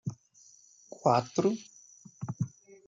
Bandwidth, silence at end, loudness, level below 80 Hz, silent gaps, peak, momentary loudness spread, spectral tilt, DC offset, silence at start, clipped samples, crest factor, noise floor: 7.8 kHz; 0.4 s; -31 LUFS; -74 dBFS; none; -10 dBFS; 24 LU; -6.5 dB/octave; under 0.1%; 0.05 s; under 0.1%; 24 dB; -60 dBFS